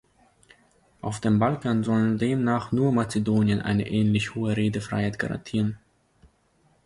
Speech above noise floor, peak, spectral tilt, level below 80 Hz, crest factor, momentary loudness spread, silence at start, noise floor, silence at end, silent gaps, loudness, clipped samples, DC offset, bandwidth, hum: 40 dB; -10 dBFS; -7 dB/octave; -52 dBFS; 16 dB; 6 LU; 1.05 s; -64 dBFS; 1.1 s; none; -25 LUFS; under 0.1%; under 0.1%; 11.5 kHz; none